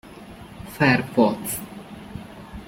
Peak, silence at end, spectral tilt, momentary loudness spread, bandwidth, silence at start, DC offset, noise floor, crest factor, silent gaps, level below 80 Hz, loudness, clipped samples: -4 dBFS; 0 s; -5 dB/octave; 22 LU; 16.5 kHz; 0.05 s; under 0.1%; -41 dBFS; 22 dB; none; -50 dBFS; -21 LUFS; under 0.1%